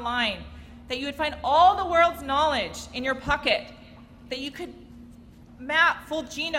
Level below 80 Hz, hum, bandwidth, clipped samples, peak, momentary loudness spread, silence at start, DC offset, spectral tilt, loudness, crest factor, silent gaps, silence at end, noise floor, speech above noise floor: -48 dBFS; none; 16 kHz; under 0.1%; -8 dBFS; 18 LU; 0 s; under 0.1%; -3.5 dB/octave; -24 LUFS; 18 dB; none; 0 s; -48 dBFS; 24 dB